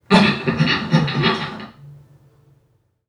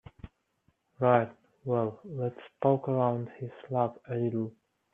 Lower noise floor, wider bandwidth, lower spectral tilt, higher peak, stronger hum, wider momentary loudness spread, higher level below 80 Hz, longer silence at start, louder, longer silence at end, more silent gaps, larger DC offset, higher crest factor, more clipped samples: second, -62 dBFS vs -73 dBFS; first, 11 kHz vs 3.8 kHz; second, -6 dB/octave vs -10.5 dB/octave; first, 0 dBFS vs -8 dBFS; neither; first, 17 LU vs 14 LU; first, -48 dBFS vs -66 dBFS; second, 0.1 s vs 0.25 s; first, -18 LUFS vs -31 LUFS; first, 1.15 s vs 0.45 s; neither; neither; about the same, 20 dB vs 24 dB; neither